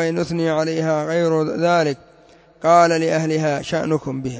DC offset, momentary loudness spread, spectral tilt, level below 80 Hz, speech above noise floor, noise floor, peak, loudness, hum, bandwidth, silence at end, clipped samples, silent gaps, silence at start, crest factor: under 0.1%; 8 LU; -6 dB/octave; -56 dBFS; 31 dB; -50 dBFS; -2 dBFS; -19 LUFS; none; 8 kHz; 0 s; under 0.1%; none; 0 s; 18 dB